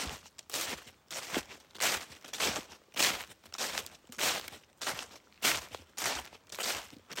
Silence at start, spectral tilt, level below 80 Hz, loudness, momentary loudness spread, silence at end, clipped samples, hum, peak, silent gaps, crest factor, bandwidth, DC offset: 0 s; 0 dB/octave; -64 dBFS; -35 LUFS; 14 LU; 0 s; under 0.1%; none; -10 dBFS; none; 28 dB; 17 kHz; under 0.1%